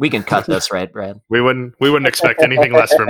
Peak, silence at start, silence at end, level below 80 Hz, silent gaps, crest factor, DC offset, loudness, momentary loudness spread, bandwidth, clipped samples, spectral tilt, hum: 0 dBFS; 0 s; 0 s; -52 dBFS; none; 14 dB; under 0.1%; -14 LUFS; 10 LU; 19 kHz; under 0.1%; -4.5 dB/octave; none